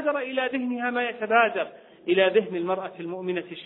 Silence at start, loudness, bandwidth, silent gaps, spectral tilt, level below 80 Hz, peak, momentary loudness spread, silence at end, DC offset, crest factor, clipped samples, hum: 0 s; -25 LUFS; 4.1 kHz; none; -8.5 dB/octave; -74 dBFS; -6 dBFS; 12 LU; 0 s; under 0.1%; 20 dB; under 0.1%; none